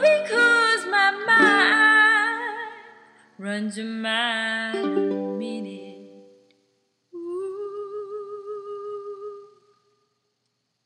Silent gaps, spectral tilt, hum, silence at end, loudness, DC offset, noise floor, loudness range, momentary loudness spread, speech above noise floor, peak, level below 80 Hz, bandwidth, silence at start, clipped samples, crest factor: none; -3 dB/octave; none; 1.4 s; -20 LUFS; under 0.1%; -75 dBFS; 17 LU; 20 LU; 49 dB; -4 dBFS; -86 dBFS; 11.5 kHz; 0 s; under 0.1%; 20 dB